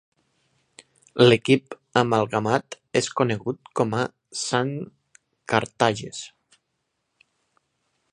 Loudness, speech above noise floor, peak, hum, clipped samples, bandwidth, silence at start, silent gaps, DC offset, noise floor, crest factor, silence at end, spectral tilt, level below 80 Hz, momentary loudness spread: -23 LUFS; 54 dB; -2 dBFS; none; under 0.1%; 10.5 kHz; 1.15 s; none; under 0.1%; -77 dBFS; 24 dB; 1.85 s; -5 dB/octave; -64 dBFS; 17 LU